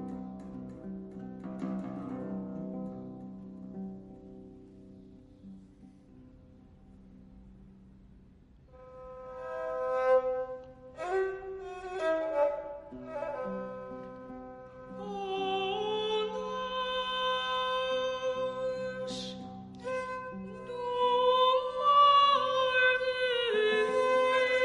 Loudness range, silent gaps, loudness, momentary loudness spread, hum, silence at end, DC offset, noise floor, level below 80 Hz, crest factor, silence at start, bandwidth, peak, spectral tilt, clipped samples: 19 LU; none; -30 LUFS; 20 LU; none; 0 s; under 0.1%; -58 dBFS; -62 dBFS; 18 dB; 0 s; 11 kHz; -14 dBFS; -4.5 dB/octave; under 0.1%